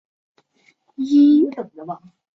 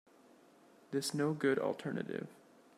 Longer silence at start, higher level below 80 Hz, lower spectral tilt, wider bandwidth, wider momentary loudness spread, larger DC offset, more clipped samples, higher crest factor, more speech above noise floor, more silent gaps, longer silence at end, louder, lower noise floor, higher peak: about the same, 1 s vs 0.9 s; first, -68 dBFS vs -84 dBFS; first, -7 dB/octave vs -5 dB/octave; second, 6.2 kHz vs 15 kHz; first, 21 LU vs 11 LU; neither; neither; about the same, 14 dB vs 18 dB; first, 43 dB vs 28 dB; neither; about the same, 0.4 s vs 0.45 s; first, -16 LUFS vs -37 LUFS; second, -60 dBFS vs -64 dBFS; first, -6 dBFS vs -20 dBFS